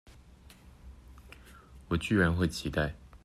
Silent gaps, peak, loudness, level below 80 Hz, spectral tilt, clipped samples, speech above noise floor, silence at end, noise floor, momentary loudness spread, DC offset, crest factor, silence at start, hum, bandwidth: none; -14 dBFS; -30 LUFS; -48 dBFS; -6 dB/octave; under 0.1%; 26 dB; 0.05 s; -55 dBFS; 26 LU; under 0.1%; 20 dB; 0.85 s; none; 14 kHz